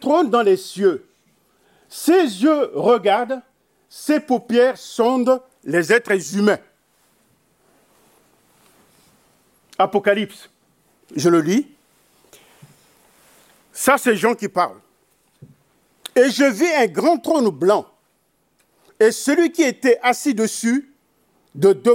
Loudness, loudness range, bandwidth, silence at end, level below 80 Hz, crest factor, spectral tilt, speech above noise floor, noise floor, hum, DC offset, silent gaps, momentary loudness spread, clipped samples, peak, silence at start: -18 LUFS; 7 LU; 16.5 kHz; 0 s; -68 dBFS; 18 dB; -4.5 dB/octave; 48 dB; -65 dBFS; none; under 0.1%; none; 8 LU; under 0.1%; -2 dBFS; 0 s